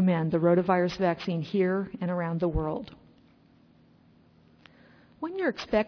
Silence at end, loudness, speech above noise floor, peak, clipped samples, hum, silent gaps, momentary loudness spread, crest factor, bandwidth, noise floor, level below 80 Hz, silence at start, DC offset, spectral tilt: 0 s; -28 LUFS; 33 dB; -12 dBFS; under 0.1%; none; none; 12 LU; 18 dB; 5.4 kHz; -60 dBFS; -48 dBFS; 0 s; under 0.1%; -8 dB/octave